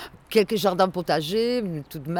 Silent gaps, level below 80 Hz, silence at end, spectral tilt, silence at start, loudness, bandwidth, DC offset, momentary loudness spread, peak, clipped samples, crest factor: none; -56 dBFS; 0 s; -5.5 dB/octave; 0 s; -24 LUFS; 19.5 kHz; under 0.1%; 8 LU; -8 dBFS; under 0.1%; 16 dB